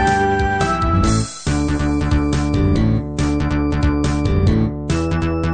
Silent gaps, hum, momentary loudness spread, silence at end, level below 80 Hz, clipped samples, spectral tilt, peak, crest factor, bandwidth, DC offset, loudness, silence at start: none; none; 4 LU; 0 s; -24 dBFS; under 0.1%; -6.5 dB/octave; -4 dBFS; 12 dB; 9.4 kHz; 0.4%; -18 LUFS; 0 s